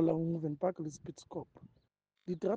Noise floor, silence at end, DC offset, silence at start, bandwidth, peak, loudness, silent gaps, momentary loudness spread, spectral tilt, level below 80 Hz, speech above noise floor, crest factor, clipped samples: -77 dBFS; 0 s; under 0.1%; 0 s; 9 kHz; -18 dBFS; -38 LUFS; none; 16 LU; -8 dB/octave; -72 dBFS; 42 dB; 18 dB; under 0.1%